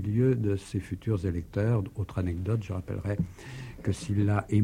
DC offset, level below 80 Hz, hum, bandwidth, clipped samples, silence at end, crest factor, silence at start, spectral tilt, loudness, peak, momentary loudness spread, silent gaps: under 0.1%; -48 dBFS; none; 11 kHz; under 0.1%; 0 s; 16 dB; 0 s; -8 dB/octave; -30 LUFS; -12 dBFS; 9 LU; none